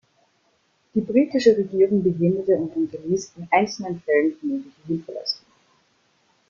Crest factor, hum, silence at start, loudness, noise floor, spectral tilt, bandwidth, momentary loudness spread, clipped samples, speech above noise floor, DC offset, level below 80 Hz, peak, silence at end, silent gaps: 20 dB; none; 0.95 s; -22 LUFS; -65 dBFS; -6 dB/octave; 7.4 kHz; 11 LU; under 0.1%; 44 dB; under 0.1%; -62 dBFS; -4 dBFS; 1.15 s; none